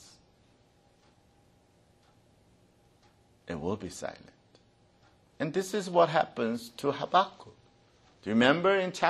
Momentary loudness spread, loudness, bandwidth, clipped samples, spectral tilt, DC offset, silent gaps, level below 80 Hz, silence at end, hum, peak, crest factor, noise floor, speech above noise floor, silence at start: 17 LU; -29 LUFS; 13 kHz; under 0.1%; -5 dB/octave; under 0.1%; none; -68 dBFS; 0 s; none; -8 dBFS; 24 dB; -65 dBFS; 36 dB; 3.45 s